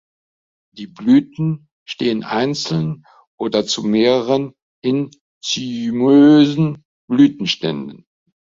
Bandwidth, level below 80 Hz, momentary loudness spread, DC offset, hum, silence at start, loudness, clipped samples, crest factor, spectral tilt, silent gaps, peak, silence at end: 7.6 kHz; -58 dBFS; 18 LU; under 0.1%; none; 0.75 s; -17 LUFS; under 0.1%; 16 dB; -6 dB/octave; 1.72-1.86 s, 3.27-3.38 s, 4.62-4.82 s, 5.21-5.41 s, 6.85-7.08 s; -2 dBFS; 0.5 s